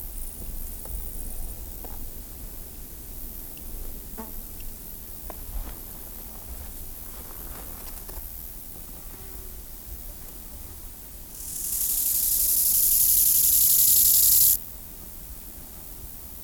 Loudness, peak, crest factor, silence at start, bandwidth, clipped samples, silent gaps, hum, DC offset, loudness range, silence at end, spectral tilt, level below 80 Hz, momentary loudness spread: -18 LUFS; -10 dBFS; 18 dB; 0 s; over 20 kHz; under 0.1%; none; none; 0.1%; 20 LU; 0 s; -0.5 dB/octave; -40 dBFS; 23 LU